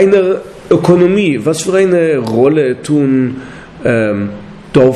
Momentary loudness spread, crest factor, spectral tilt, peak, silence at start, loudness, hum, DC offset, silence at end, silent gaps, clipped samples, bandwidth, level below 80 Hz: 10 LU; 10 dB; -6.5 dB/octave; 0 dBFS; 0 s; -12 LUFS; none; under 0.1%; 0 s; none; under 0.1%; 13 kHz; -44 dBFS